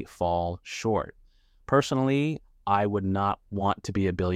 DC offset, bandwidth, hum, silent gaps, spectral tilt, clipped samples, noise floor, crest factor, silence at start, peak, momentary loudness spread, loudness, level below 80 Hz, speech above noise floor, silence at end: under 0.1%; 14 kHz; none; none; -6.5 dB/octave; under 0.1%; -51 dBFS; 18 dB; 0 s; -8 dBFS; 7 LU; -27 LUFS; -52 dBFS; 24 dB; 0 s